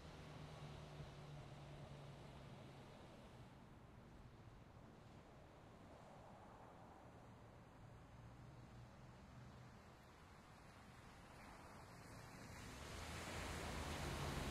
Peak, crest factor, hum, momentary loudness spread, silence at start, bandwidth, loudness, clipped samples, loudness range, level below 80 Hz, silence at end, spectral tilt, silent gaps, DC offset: -34 dBFS; 22 dB; none; 14 LU; 0 s; 15.5 kHz; -57 LUFS; under 0.1%; 9 LU; -64 dBFS; 0 s; -4.5 dB/octave; none; under 0.1%